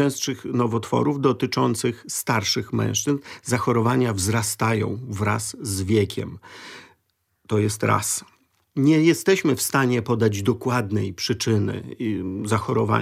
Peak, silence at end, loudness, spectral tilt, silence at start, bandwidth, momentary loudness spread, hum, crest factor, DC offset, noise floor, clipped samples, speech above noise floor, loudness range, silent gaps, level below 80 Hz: -6 dBFS; 0 s; -23 LUFS; -5 dB/octave; 0 s; 16 kHz; 8 LU; none; 16 dB; under 0.1%; -71 dBFS; under 0.1%; 49 dB; 4 LU; none; -58 dBFS